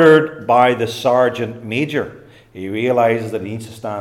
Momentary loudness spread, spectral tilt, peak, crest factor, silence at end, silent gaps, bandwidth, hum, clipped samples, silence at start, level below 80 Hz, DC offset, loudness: 14 LU; -6 dB/octave; 0 dBFS; 16 dB; 0 s; none; 14 kHz; none; under 0.1%; 0 s; -58 dBFS; under 0.1%; -17 LUFS